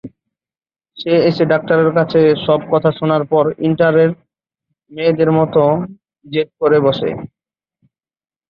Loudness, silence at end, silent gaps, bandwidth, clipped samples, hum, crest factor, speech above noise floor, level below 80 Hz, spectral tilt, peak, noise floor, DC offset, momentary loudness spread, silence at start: -14 LUFS; 1.25 s; none; 5.6 kHz; under 0.1%; none; 14 dB; over 76 dB; -54 dBFS; -9.5 dB/octave; -2 dBFS; under -90 dBFS; under 0.1%; 10 LU; 0.05 s